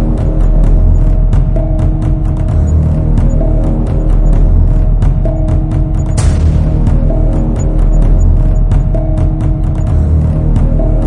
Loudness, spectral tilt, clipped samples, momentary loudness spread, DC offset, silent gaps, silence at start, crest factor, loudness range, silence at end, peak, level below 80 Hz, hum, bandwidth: -12 LUFS; -9 dB/octave; under 0.1%; 3 LU; under 0.1%; none; 0 s; 8 dB; 1 LU; 0 s; 0 dBFS; -10 dBFS; none; 10 kHz